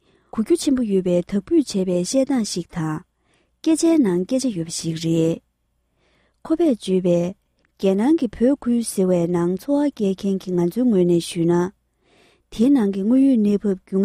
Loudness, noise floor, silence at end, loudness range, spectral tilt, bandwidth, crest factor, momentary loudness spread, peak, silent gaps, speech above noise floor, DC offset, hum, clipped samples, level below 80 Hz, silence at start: -20 LUFS; -69 dBFS; 0 s; 3 LU; -6.5 dB/octave; 15 kHz; 14 dB; 9 LU; -6 dBFS; none; 50 dB; under 0.1%; none; under 0.1%; -52 dBFS; 0.35 s